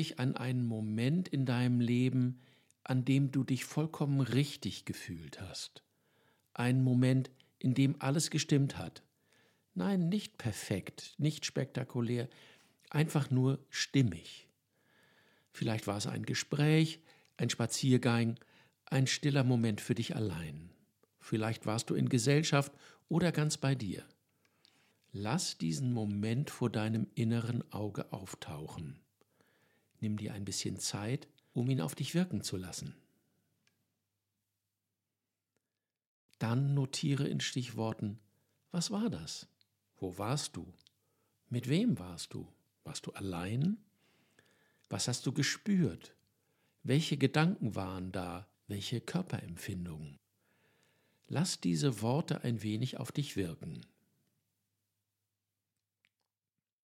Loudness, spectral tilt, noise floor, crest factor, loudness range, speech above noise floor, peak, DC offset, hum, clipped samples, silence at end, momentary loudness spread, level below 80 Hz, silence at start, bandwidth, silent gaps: -35 LUFS; -5.5 dB/octave; under -90 dBFS; 24 dB; 8 LU; over 56 dB; -12 dBFS; under 0.1%; none; under 0.1%; 3 s; 14 LU; -70 dBFS; 0 s; 15.5 kHz; 36.07-36.29 s